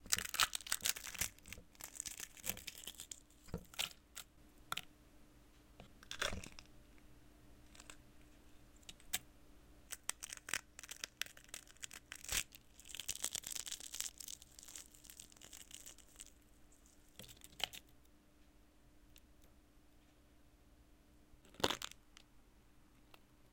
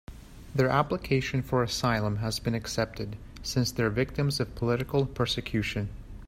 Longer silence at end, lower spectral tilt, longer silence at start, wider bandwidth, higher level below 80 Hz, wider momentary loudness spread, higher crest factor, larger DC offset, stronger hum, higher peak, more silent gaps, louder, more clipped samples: about the same, 0.05 s vs 0 s; second, -0.5 dB/octave vs -5.5 dB/octave; about the same, 0 s vs 0.1 s; about the same, 17 kHz vs 16 kHz; second, -66 dBFS vs -46 dBFS; first, 26 LU vs 9 LU; first, 40 dB vs 20 dB; neither; neither; about the same, -8 dBFS vs -10 dBFS; neither; second, -44 LUFS vs -29 LUFS; neither